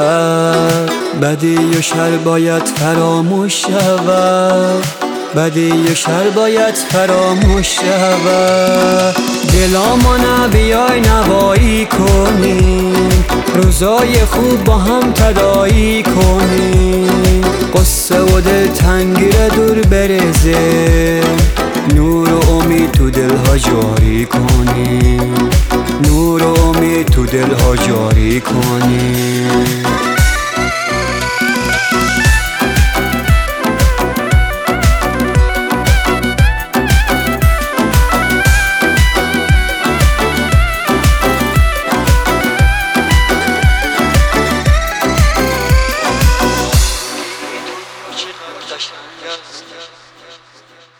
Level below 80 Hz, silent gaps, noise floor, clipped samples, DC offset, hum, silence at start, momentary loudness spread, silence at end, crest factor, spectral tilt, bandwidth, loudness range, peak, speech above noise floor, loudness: -16 dBFS; none; -43 dBFS; under 0.1%; under 0.1%; none; 0 s; 4 LU; 0.65 s; 10 dB; -5 dB/octave; over 20 kHz; 3 LU; 0 dBFS; 33 dB; -11 LUFS